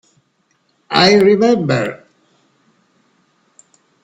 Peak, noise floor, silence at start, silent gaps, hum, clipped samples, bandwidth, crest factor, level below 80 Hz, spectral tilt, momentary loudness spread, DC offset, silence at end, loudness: 0 dBFS; -62 dBFS; 0.9 s; none; none; under 0.1%; 10.5 kHz; 18 dB; -58 dBFS; -5 dB/octave; 9 LU; under 0.1%; 2.1 s; -13 LUFS